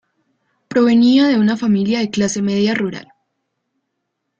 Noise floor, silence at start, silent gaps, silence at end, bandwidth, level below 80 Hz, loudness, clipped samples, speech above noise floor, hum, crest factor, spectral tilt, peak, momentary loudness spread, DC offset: -74 dBFS; 0.7 s; none; 1.4 s; 8.6 kHz; -58 dBFS; -15 LUFS; under 0.1%; 60 dB; none; 14 dB; -5.5 dB/octave; -2 dBFS; 10 LU; under 0.1%